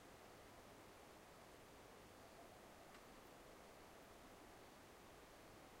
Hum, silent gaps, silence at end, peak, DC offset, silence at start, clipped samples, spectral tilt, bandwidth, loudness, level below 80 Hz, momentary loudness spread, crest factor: none; none; 0 s; -48 dBFS; under 0.1%; 0 s; under 0.1%; -3.5 dB/octave; 16 kHz; -63 LUFS; -76 dBFS; 1 LU; 14 dB